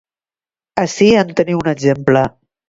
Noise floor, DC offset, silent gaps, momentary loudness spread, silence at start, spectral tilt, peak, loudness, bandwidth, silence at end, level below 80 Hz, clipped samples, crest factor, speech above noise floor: under -90 dBFS; under 0.1%; none; 9 LU; 0.75 s; -6 dB/octave; 0 dBFS; -15 LUFS; 7.8 kHz; 0.4 s; -48 dBFS; under 0.1%; 16 dB; over 77 dB